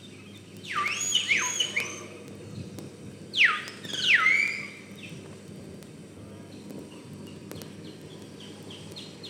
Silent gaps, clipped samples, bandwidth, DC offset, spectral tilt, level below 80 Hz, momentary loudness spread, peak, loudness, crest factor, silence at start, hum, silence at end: none; under 0.1%; 17.5 kHz; under 0.1%; -1 dB/octave; -70 dBFS; 23 LU; -10 dBFS; -24 LUFS; 22 dB; 0 s; none; 0 s